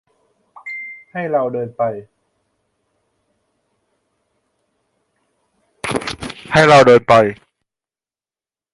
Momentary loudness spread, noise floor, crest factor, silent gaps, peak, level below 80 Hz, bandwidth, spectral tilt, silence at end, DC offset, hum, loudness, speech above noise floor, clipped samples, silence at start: 21 LU; under -90 dBFS; 18 dB; none; 0 dBFS; -50 dBFS; 11.5 kHz; -5 dB/octave; 1.4 s; under 0.1%; none; -14 LUFS; over 78 dB; under 0.1%; 0.65 s